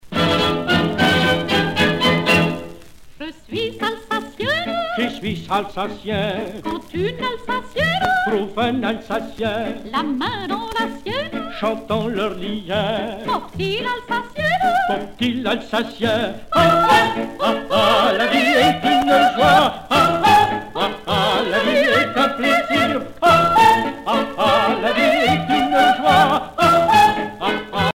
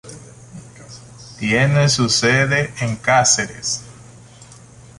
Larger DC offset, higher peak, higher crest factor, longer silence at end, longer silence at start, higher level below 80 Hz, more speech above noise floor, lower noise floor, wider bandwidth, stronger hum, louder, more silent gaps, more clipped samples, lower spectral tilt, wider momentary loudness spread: neither; about the same, -2 dBFS vs -2 dBFS; about the same, 16 dB vs 18 dB; second, 0.05 s vs 0.55 s; about the same, 0.05 s vs 0.05 s; about the same, -46 dBFS vs -50 dBFS; second, 20 dB vs 26 dB; second, -38 dBFS vs -43 dBFS; first, 16.5 kHz vs 11.5 kHz; neither; about the same, -18 LUFS vs -16 LUFS; neither; neither; first, -5 dB/octave vs -3.5 dB/octave; second, 11 LU vs 24 LU